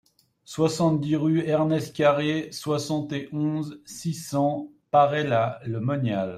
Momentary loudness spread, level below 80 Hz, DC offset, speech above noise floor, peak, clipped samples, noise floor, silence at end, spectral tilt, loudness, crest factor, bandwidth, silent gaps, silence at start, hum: 10 LU; -64 dBFS; under 0.1%; 26 dB; -6 dBFS; under 0.1%; -50 dBFS; 0 s; -6.5 dB/octave; -25 LUFS; 18 dB; 14.5 kHz; none; 0.5 s; none